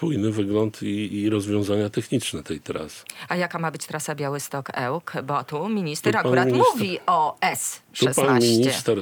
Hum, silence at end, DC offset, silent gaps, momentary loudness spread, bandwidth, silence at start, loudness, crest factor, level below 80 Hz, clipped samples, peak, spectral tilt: none; 0 s; under 0.1%; none; 11 LU; over 20 kHz; 0 s; -23 LUFS; 18 dB; -64 dBFS; under 0.1%; -6 dBFS; -4.5 dB/octave